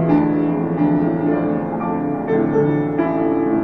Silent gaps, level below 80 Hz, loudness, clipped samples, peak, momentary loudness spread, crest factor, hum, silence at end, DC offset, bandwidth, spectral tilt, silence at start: none; -48 dBFS; -18 LUFS; under 0.1%; -6 dBFS; 5 LU; 12 dB; none; 0 s; 0.3%; 4.2 kHz; -11 dB/octave; 0 s